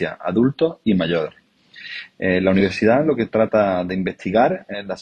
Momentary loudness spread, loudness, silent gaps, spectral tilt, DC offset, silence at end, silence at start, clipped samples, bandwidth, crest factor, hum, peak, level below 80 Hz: 13 LU; -19 LUFS; none; -7.5 dB/octave; under 0.1%; 0 s; 0 s; under 0.1%; 8.8 kHz; 16 dB; none; -2 dBFS; -54 dBFS